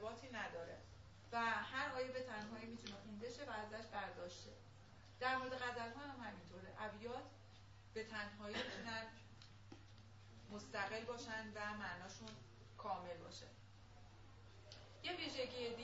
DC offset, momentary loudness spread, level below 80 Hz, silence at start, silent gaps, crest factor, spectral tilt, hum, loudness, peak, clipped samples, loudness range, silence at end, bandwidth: under 0.1%; 20 LU; -72 dBFS; 0 s; none; 20 dB; -2 dB/octave; none; -48 LUFS; -30 dBFS; under 0.1%; 5 LU; 0 s; 7.6 kHz